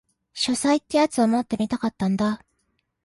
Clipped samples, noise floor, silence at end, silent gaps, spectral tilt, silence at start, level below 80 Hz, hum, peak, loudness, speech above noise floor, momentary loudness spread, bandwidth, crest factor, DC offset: under 0.1%; -72 dBFS; 0.7 s; none; -4.5 dB/octave; 0.35 s; -58 dBFS; none; -8 dBFS; -23 LUFS; 50 dB; 6 LU; 11.5 kHz; 16 dB; under 0.1%